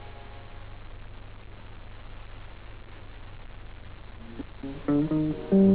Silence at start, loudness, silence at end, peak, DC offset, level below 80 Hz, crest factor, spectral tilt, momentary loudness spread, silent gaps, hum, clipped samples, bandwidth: 0 s; -28 LUFS; 0 s; -10 dBFS; 0.4%; -46 dBFS; 20 dB; -8.5 dB/octave; 21 LU; none; none; under 0.1%; 4 kHz